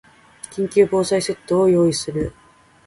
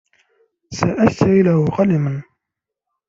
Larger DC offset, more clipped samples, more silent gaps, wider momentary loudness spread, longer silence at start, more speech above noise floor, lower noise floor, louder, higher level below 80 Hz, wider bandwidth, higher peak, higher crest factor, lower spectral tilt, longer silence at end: neither; neither; neither; about the same, 13 LU vs 12 LU; second, 0.5 s vs 0.7 s; second, 24 dB vs 68 dB; second, -42 dBFS vs -83 dBFS; second, -19 LUFS vs -16 LUFS; about the same, -48 dBFS vs -50 dBFS; first, 11.5 kHz vs 7.6 kHz; about the same, -4 dBFS vs -2 dBFS; about the same, 16 dB vs 16 dB; second, -5.5 dB/octave vs -7.5 dB/octave; second, 0.55 s vs 0.85 s